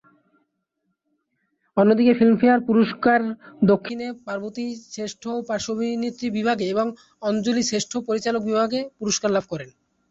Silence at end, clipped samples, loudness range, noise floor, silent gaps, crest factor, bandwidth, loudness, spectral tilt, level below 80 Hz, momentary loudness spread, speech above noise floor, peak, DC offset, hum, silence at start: 0.4 s; under 0.1%; 6 LU; -75 dBFS; none; 16 dB; 8 kHz; -22 LUFS; -5 dB/octave; -62 dBFS; 14 LU; 54 dB; -6 dBFS; under 0.1%; none; 1.75 s